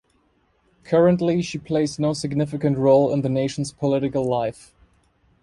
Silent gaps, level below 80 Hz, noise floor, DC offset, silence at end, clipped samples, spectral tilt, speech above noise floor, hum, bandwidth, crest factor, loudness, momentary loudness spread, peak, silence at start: none; -54 dBFS; -64 dBFS; under 0.1%; 0.9 s; under 0.1%; -7 dB/octave; 43 dB; none; 11.5 kHz; 16 dB; -21 LUFS; 8 LU; -6 dBFS; 0.85 s